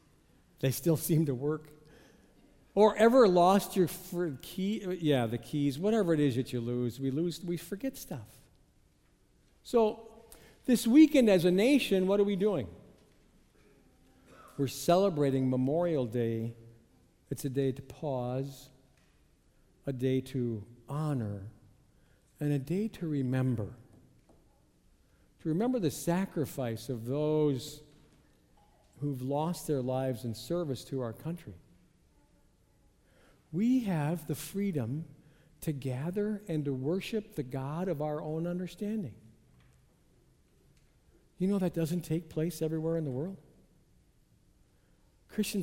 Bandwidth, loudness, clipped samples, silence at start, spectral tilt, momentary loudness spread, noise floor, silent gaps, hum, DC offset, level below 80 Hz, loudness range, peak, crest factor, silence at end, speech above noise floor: 16 kHz; -31 LUFS; under 0.1%; 0.6 s; -6.5 dB/octave; 15 LU; -67 dBFS; none; none; under 0.1%; -62 dBFS; 10 LU; -10 dBFS; 22 dB; 0 s; 37 dB